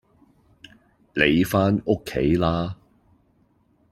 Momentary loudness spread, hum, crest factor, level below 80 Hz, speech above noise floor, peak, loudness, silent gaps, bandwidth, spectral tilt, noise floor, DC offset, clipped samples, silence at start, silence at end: 13 LU; none; 22 dB; -46 dBFS; 42 dB; -2 dBFS; -22 LUFS; none; 15.5 kHz; -6.5 dB/octave; -63 dBFS; under 0.1%; under 0.1%; 1.15 s; 1.15 s